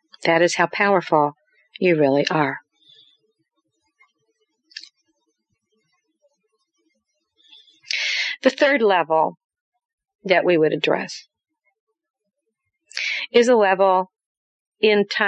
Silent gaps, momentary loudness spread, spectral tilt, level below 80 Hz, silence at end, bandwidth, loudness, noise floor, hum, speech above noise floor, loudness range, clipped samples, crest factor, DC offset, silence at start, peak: 9.44-9.49 s, 9.61-9.72 s, 9.85-9.98 s, 10.15-10.19 s, 11.80-11.87 s, 12.10-12.14 s, 14.26-14.72 s; 17 LU; -4.5 dB/octave; -74 dBFS; 0 s; 9.2 kHz; -19 LUFS; -78 dBFS; none; 60 dB; 7 LU; under 0.1%; 20 dB; under 0.1%; 0.2 s; -2 dBFS